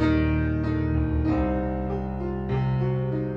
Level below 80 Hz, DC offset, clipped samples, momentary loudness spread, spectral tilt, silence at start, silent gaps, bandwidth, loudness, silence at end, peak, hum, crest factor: -32 dBFS; under 0.1%; under 0.1%; 6 LU; -10 dB/octave; 0 s; none; 6 kHz; -26 LUFS; 0 s; -10 dBFS; none; 14 dB